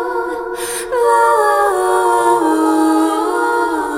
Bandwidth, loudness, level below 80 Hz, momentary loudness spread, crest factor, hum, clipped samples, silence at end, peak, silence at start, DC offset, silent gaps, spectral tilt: 16.5 kHz; -14 LUFS; -50 dBFS; 9 LU; 14 dB; none; under 0.1%; 0 s; -2 dBFS; 0 s; under 0.1%; none; -2.5 dB/octave